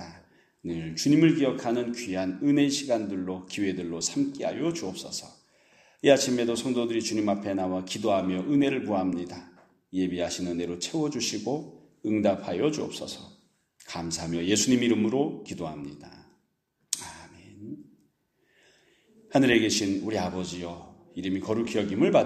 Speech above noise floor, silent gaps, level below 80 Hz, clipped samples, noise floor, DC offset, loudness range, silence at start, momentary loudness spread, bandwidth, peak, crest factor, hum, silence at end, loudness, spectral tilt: 48 dB; none; -62 dBFS; under 0.1%; -74 dBFS; under 0.1%; 5 LU; 0 s; 17 LU; 14 kHz; -4 dBFS; 24 dB; none; 0 s; -27 LUFS; -4.5 dB/octave